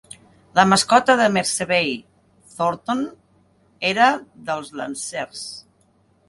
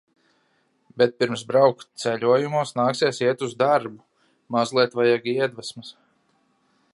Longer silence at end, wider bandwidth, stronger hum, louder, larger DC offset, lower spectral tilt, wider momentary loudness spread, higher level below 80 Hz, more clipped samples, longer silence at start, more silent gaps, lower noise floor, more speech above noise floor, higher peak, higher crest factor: second, 0.7 s vs 1.05 s; about the same, 11.5 kHz vs 11.5 kHz; neither; about the same, -20 LUFS vs -22 LUFS; neither; second, -3.5 dB/octave vs -5 dB/octave; first, 16 LU vs 11 LU; first, -62 dBFS vs -72 dBFS; neither; second, 0.55 s vs 0.95 s; neither; second, -60 dBFS vs -67 dBFS; second, 40 dB vs 45 dB; first, 0 dBFS vs -4 dBFS; about the same, 22 dB vs 20 dB